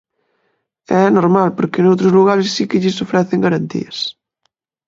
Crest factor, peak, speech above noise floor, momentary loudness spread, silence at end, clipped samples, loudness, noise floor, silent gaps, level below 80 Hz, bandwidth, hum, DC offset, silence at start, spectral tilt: 16 dB; 0 dBFS; 55 dB; 11 LU; 0.75 s; under 0.1%; -15 LUFS; -69 dBFS; none; -58 dBFS; 7.8 kHz; none; under 0.1%; 0.9 s; -6.5 dB/octave